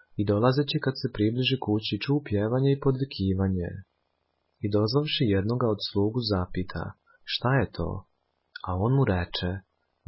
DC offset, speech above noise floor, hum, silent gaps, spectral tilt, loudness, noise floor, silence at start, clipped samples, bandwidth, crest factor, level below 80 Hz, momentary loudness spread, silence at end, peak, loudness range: under 0.1%; 49 dB; none; none; -10.5 dB/octave; -27 LUFS; -75 dBFS; 0.15 s; under 0.1%; 5.8 kHz; 18 dB; -44 dBFS; 12 LU; 0.45 s; -10 dBFS; 3 LU